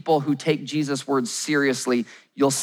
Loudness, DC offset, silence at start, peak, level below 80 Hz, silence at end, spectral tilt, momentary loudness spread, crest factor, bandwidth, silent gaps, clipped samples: -23 LUFS; under 0.1%; 0.05 s; -8 dBFS; -86 dBFS; 0 s; -4 dB/octave; 4 LU; 16 dB; 19.5 kHz; none; under 0.1%